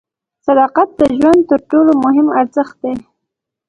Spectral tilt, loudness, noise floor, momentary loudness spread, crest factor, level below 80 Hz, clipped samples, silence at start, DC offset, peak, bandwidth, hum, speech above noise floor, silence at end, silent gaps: -7 dB/octave; -12 LUFS; -78 dBFS; 12 LU; 12 dB; -48 dBFS; under 0.1%; 0.45 s; under 0.1%; 0 dBFS; 10.5 kHz; none; 66 dB; 0.7 s; none